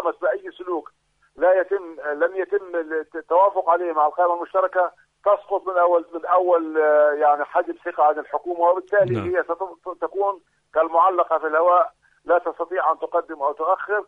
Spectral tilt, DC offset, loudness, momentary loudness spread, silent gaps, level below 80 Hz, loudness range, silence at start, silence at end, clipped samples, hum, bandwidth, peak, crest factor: -8 dB/octave; under 0.1%; -21 LUFS; 11 LU; none; -66 dBFS; 3 LU; 0 s; 0.05 s; under 0.1%; none; 3.9 kHz; -6 dBFS; 14 dB